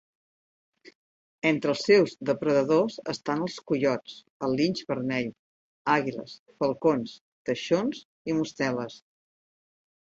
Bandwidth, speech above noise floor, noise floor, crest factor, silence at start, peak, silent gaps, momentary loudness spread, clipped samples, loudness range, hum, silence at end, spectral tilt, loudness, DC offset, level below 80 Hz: 8 kHz; over 64 dB; under -90 dBFS; 20 dB; 0.85 s; -8 dBFS; 0.95-1.42 s, 4.30-4.40 s, 5.39-5.85 s, 6.39-6.46 s, 7.21-7.45 s, 8.05-8.25 s; 13 LU; under 0.1%; 4 LU; none; 1.1 s; -5.5 dB/octave; -27 LUFS; under 0.1%; -68 dBFS